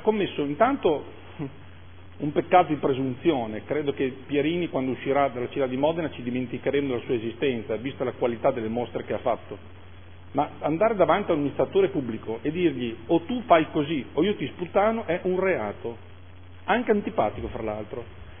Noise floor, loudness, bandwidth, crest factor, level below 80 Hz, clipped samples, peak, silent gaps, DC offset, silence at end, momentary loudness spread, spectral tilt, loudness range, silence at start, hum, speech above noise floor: -47 dBFS; -26 LUFS; 3.6 kHz; 22 dB; -54 dBFS; under 0.1%; -4 dBFS; none; 0.5%; 0 s; 11 LU; -10.5 dB/octave; 3 LU; 0 s; none; 21 dB